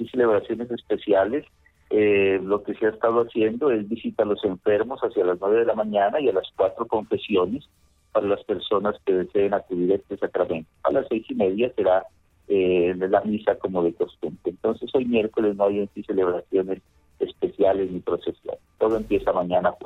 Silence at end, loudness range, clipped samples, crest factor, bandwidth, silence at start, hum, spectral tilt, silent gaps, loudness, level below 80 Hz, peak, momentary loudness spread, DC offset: 0 s; 2 LU; under 0.1%; 18 dB; 4.1 kHz; 0 s; none; -8 dB/octave; none; -24 LUFS; -56 dBFS; -6 dBFS; 7 LU; under 0.1%